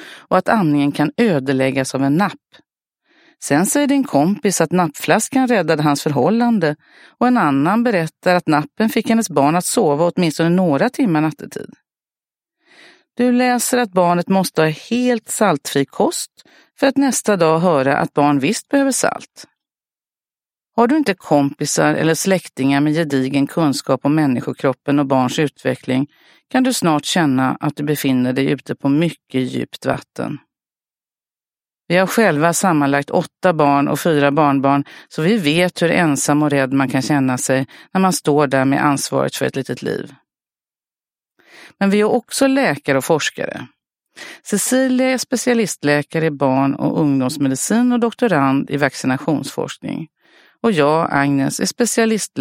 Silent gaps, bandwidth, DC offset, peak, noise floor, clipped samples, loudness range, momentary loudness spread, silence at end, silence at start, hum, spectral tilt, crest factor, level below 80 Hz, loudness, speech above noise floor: none; 16.5 kHz; under 0.1%; 0 dBFS; under -90 dBFS; under 0.1%; 4 LU; 7 LU; 0 s; 0 s; none; -5 dB/octave; 18 dB; -60 dBFS; -17 LUFS; over 74 dB